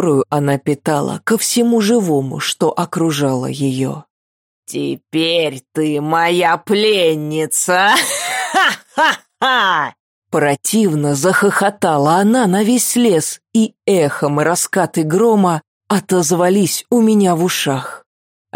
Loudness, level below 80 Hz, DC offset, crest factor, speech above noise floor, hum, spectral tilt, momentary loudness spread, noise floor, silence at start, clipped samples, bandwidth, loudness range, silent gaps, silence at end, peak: -15 LUFS; -64 dBFS; under 0.1%; 12 dB; over 75 dB; none; -4 dB/octave; 7 LU; under -90 dBFS; 0 s; under 0.1%; 17 kHz; 4 LU; 4.10-4.63 s, 10.00-10.22 s, 15.68-15.81 s; 0.55 s; -2 dBFS